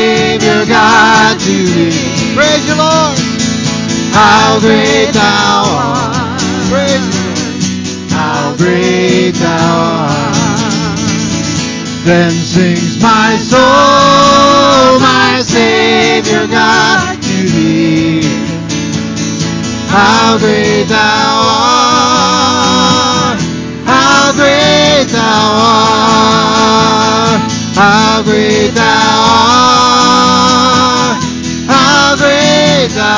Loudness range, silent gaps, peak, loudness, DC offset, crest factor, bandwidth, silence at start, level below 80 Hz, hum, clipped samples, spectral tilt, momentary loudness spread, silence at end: 5 LU; none; 0 dBFS; -8 LUFS; under 0.1%; 8 dB; 8 kHz; 0 s; -34 dBFS; none; 0.4%; -4 dB/octave; 8 LU; 0 s